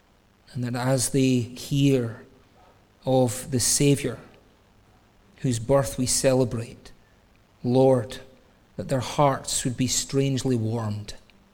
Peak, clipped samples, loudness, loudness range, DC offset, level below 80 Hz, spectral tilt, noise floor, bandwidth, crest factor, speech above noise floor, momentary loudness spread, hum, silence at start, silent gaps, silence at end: -8 dBFS; under 0.1%; -24 LUFS; 2 LU; under 0.1%; -50 dBFS; -5 dB/octave; -58 dBFS; 18.5 kHz; 18 dB; 35 dB; 16 LU; none; 0.55 s; none; 0.35 s